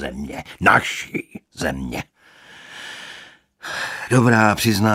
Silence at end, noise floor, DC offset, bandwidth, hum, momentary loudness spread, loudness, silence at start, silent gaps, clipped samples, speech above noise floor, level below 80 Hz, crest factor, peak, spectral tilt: 0 s; -47 dBFS; under 0.1%; 16 kHz; none; 22 LU; -19 LUFS; 0 s; none; under 0.1%; 28 dB; -46 dBFS; 20 dB; 0 dBFS; -5 dB/octave